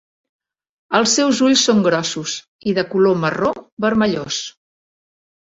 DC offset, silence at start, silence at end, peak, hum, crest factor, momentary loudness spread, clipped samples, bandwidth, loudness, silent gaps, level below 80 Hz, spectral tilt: under 0.1%; 0.9 s; 1.1 s; 0 dBFS; none; 18 dB; 11 LU; under 0.1%; 8 kHz; -17 LUFS; 2.48-2.59 s, 3.72-3.77 s; -56 dBFS; -3.5 dB/octave